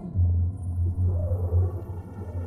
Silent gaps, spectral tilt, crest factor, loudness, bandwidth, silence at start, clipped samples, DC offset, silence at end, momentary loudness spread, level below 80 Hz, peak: none; -11.5 dB/octave; 12 dB; -27 LUFS; 1.9 kHz; 0 s; under 0.1%; under 0.1%; 0 s; 11 LU; -34 dBFS; -14 dBFS